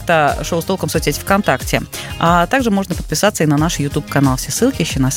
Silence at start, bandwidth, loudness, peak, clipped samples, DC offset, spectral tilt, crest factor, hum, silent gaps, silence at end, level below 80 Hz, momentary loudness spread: 0 s; 17 kHz; -16 LUFS; 0 dBFS; under 0.1%; under 0.1%; -4.5 dB/octave; 16 dB; none; none; 0 s; -32 dBFS; 6 LU